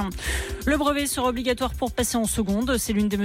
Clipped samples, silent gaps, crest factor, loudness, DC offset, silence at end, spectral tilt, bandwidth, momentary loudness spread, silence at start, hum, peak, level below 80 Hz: under 0.1%; none; 12 dB; -24 LUFS; under 0.1%; 0 s; -4 dB/octave; 16.5 kHz; 4 LU; 0 s; none; -12 dBFS; -36 dBFS